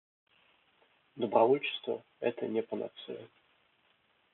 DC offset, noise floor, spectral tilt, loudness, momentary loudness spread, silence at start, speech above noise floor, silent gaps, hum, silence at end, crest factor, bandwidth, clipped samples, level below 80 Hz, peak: under 0.1%; -71 dBFS; -3 dB/octave; -32 LUFS; 18 LU; 1.15 s; 39 dB; none; none; 1.1 s; 24 dB; 4.2 kHz; under 0.1%; -90 dBFS; -12 dBFS